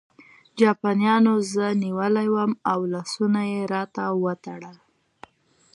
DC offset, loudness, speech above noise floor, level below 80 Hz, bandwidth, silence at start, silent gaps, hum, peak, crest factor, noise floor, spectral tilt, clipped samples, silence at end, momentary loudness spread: under 0.1%; -23 LUFS; 38 dB; -72 dBFS; 11.5 kHz; 0.55 s; none; none; -6 dBFS; 18 dB; -60 dBFS; -6 dB/octave; under 0.1%; 1 s; 9 LU